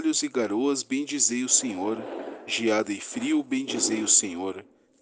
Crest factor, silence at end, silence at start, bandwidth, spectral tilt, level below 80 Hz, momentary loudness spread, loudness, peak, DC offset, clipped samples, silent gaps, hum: 22 dB; 0.4 s; 0 s; 10.5 kHz; -1.5 dB/octave; -74 dBFS; 13 LU; -25 LUFS; -6 dBFS; under 0.1%; under 0.1%; none; none